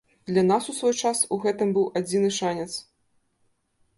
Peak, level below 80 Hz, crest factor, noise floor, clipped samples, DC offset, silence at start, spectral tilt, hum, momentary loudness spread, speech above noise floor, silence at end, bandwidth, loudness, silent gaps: -10 dBFS; -68 dBFS; 16 dB; -69 dBFS; under 0.1%; under 0.1%; 0.25 s; -4.5 dB/octave; none; 7 LU; 46 dB; 1.15 s; 11.5 kHz; -24 LUFS; none